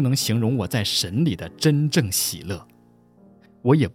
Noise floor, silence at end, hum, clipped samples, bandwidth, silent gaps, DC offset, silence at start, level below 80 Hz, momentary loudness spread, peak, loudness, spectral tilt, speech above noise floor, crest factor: -54 dBFS; 0.05 s; none; under 0.1%; 17 kHz; none; under 0.1%; 0 s; -52 dBFS; 8 LU; -4 dBFS; -22 LUFS; -5 dB/octave; 33 dB; 18 dB